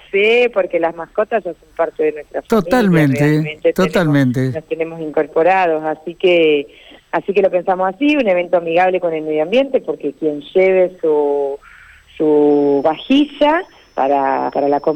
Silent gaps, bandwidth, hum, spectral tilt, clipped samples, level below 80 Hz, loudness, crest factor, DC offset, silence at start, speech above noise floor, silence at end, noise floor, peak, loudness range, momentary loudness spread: none; 17 kHz; none; -7 dB/octave; under 0.1%; -50 dBFS; -15 LUFS; 12 dB; under 0.1%; 0.15 s; 27 dB; 0 s; -42 dBFS; -4 dBFS; 1 LU; 9 LU